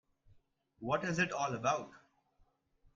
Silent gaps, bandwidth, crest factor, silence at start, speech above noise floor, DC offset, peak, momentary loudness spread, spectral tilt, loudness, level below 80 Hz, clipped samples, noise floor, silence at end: none; 7.8 kHz; 20 dB; 0.8 s; 38 dB; under 0.1%; -20 dBFS; 11 LU; -4.5 dB/octave; -35 LUFS; -70 dBFS; under 0.1%; -73 dBFS; 1 s